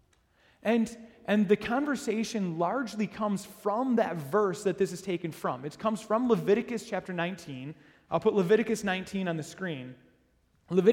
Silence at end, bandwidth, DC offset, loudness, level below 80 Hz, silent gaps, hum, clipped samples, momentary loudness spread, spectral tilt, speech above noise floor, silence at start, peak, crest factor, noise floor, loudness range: 0 s; 16.5 kHz; under 0.1%; -30 LUFS; -66 dBFS; none; none; under 0.1%; 10 LU; -6 dB/octave; 39 dB; 0.65 s; -10 dBFS; 20 dB; -68 dBFS; 2 LU